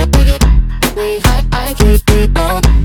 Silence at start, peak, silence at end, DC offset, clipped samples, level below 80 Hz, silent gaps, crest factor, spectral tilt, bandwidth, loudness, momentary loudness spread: 0 s; 0 dBFS; 0 s; under 0.1%; under 0.1%; -12 dBFS; none; 10 dB; -5 dB/octave; 19.5 kHz; -12 LUFS; 5 LU